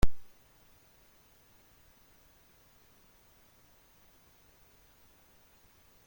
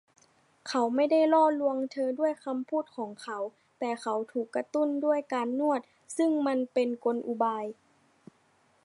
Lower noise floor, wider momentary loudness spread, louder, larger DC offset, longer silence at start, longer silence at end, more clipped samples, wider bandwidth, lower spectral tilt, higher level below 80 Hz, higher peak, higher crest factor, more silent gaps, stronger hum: second, -63 dBFS vs -67 dBFS; second, 0 LU vs 13 LU; second, -54 LUFS vs -29 LUFS; neither; second, 0.05 s vs 0.65 s; first, 5.85 s vs 1.15 s; neither; first, 16.5 kHz vs 11.5 kHz; about the same, -5.5 dB/octave vs -4.5 dB/octave; first, -44 dBFS vs -86 dBFS; about the same, -10 dBFS vs -12 dBFS; first, 24 dB vs 18 dB; neither; neither